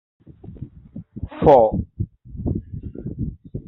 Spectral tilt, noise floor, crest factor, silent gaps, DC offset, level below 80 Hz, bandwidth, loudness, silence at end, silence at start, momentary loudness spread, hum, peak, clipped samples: -8.5 dB/octave; -40 dBFS; 20 dB; none; under 0.1%; -38 dBFS; 4.8 kHz; -20 LUFS; 0.05 s; 0.45 s; 25 LU; none; -2 dBFS; under 0.1%